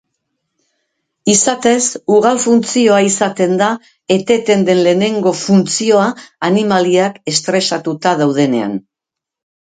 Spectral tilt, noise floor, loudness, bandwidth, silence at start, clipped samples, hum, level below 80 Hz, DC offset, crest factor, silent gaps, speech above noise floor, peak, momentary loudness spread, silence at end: -4 dB/octave; -83 dBFS; -13 LUFS; 9.6 kHz; 1.25 s; under 0.1%; none; -60 dBFS; under 0.1%; 14 dB; none; 70 dB; 0 dBFS; 6 LU; 0.85 s